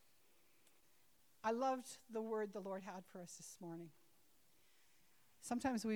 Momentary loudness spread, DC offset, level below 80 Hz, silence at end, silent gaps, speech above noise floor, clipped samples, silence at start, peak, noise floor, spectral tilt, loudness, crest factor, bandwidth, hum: 14 LU; under 0.1%; -82 dBFS; 0 s; none; 31 dB; under 0.1%; 1.45 s; -28 dBFS; -76 dBFS; -4.5 dB/octave; -46 LUFS; 20 dB; over 20 kHz; none